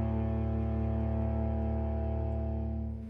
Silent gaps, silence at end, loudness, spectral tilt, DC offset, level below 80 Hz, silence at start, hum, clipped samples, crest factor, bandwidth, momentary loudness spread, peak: none; 0 s; -33 LUFS; -11.5 dB/octave; under 0.1%; -34 dBFS; 0 s; none; under 0.1%; 12 dB; 3.4 kHz; 2 LU; -20 dBFS